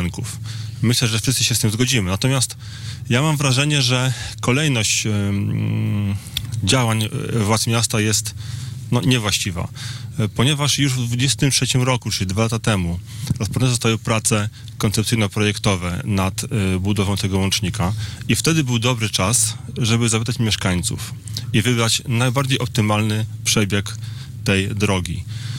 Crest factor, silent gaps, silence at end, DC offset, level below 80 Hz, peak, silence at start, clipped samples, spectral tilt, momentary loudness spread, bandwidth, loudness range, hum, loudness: 12 dB; none; 0 s; under 0.1%; -46 dBFS; -8 dBFS; 0 s; under 0.1%; -4 dB/octave; 10 LU; 16.5 kHz; 2 LU; none; -19 LUFS